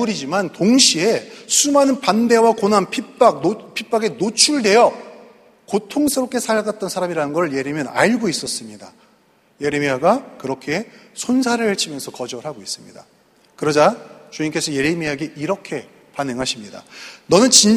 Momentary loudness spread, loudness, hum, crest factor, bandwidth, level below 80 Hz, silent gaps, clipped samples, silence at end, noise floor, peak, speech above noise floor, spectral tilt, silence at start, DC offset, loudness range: 16 LU; -18 LUFS; none; 18 dB; 15.5 kHz; -60 dBFS; none; under 0.1%; 0 s; -56 dBFS; 0 dBFS; 38 dB; -3 dB/octave; 0 s; under 0.1%; 7 LU